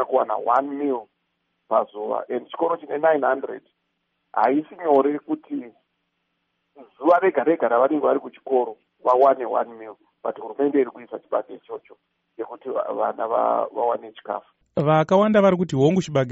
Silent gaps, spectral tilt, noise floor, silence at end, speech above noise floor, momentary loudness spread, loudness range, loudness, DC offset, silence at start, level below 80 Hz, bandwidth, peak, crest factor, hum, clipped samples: none; -6 dB/octave; -74 dBFS; 0 s; 53 dB; 15 LU; 6 LU; -22 LUFS; under 0.1%; 0 s; -66 dBFS; 7.6 kHz; -4 dBFS; 18 dB; none; under 0.1%